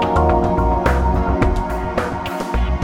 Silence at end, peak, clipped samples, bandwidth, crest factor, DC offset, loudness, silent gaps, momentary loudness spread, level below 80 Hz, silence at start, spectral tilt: 0 s; -2 dBFS; under 0.1%; 15.5 kHz; 14 dB; under 0.1%; -18 LUFS; none; 7 LU; -22 dBFS; 0 s; -7.5 dB/octave